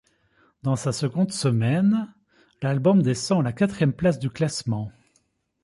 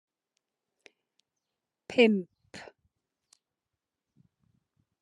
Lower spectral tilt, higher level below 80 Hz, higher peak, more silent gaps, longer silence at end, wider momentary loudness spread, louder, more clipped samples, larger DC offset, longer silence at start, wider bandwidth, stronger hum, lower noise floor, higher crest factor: about the same, -6.5 dB/octave vs -6 dB/octave; first, -56 dBFS vs -82 dBFS; about the same, -8 dBFS vs -10 dBFS; neither; second, 0.75 s vs 2.4 s; second, 10 LU vs 24 LU; first, -23 LUFS vs -26 LUFS; neither; neither; second, 0.65 s vs 1.9 s; about the same, 11.5 kHz vs 10.5 kHz; neither; second, -68 dBFS vs -88 dBFS; second, 16 dB vs 24 dB